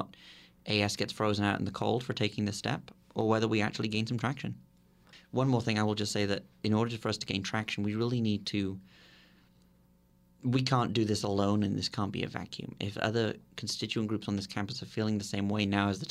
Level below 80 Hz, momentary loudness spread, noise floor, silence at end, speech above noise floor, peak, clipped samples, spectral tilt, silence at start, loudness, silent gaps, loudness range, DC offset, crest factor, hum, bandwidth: -64 dBFS; 9 LU; -65 dBFS; 0 s; 33 dB; -12 dBFS; under 0.1%; -5.5 dB/octave; 0 s; -32 LUFS; none; 3 LU; under 0.1%; 20 dB; none; 14 kHz